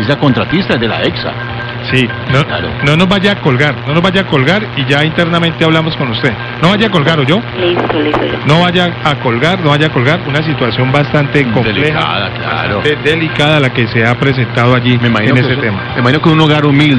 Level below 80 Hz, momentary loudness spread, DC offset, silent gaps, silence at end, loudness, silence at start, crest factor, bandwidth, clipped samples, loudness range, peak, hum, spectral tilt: -36 dBFS; 5 LU; under 0.1%; none; 0 s; -11 LUFS; 0 s; 10 dB; 10 kHz; 0.2%; 1 LU; 0 dBFS; none; -6.5 dB/octave